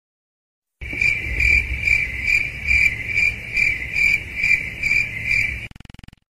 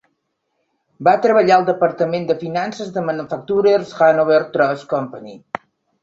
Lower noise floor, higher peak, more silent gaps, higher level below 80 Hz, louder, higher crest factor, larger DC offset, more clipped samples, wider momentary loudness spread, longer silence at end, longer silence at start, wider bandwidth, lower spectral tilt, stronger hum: second, -42 dBFS vs -71 dBFS; about the same, -4 dBFS vs -2 dBFS; neither; first, -34 dBFS vs -62 dBFS; about the same, -18 LUFS vs -17 LUFS; about the same, 16 dB vs 16 dB; neither; neither; second, 4 LU vs 18 LU; about the same, 0.65 s vs 0.65 s; second, 0.8 s vs 1 s; first, 15.5 kHz vs 7.8 kHz; second, -3 dB/octave vs -6.5 dB/octave; neither